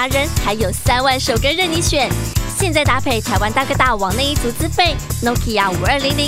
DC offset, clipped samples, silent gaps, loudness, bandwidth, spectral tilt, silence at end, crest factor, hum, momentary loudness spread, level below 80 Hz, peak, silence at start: under 0.1%; under 0.1%; none; -16 LUFS; 16 kHz; -4 dB/octave; 0 s; 16 dB; none; 4 LU; -26 dBFS; 0 dBFS; 0 s